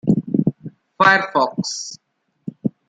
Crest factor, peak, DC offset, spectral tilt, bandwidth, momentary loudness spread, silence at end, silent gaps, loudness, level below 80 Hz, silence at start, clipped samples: 20 dB; 0 dBFS; under 0.1%; -5 dB/octave; 9.4 kHz; 22 LU; 0.2 s; none; -18 LUFS; -58 dBFS; 0.05 s; under 0.1%